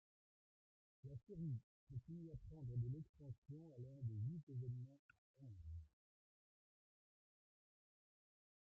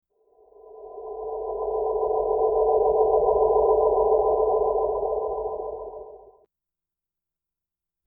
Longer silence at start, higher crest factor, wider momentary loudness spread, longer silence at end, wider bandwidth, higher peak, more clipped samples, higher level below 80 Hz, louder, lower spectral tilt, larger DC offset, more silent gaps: first, 1.05 s vs 0.65 s; about the same, 18 dB vs 16 dB; second, 12 LU vs 16 LU; first, 2.8 s vs 1.9 s; first, 2.8 kHz vs 1.3 kHz; second, -36 dBFS vs -8 dBFS; neither; second, -72 dBFS vs -48 dBFS; second, -53 LUFS vs -23 LUFS; about the same, -12.5 dB/octave vs -13.5 dB/octave; neither; first, 1.63-1.87 s, 3.09-3.14 s, 3.38-3.42 s, 4.43-4.47 s, 4.99-5.09 s, 5.18-5.34 s vs none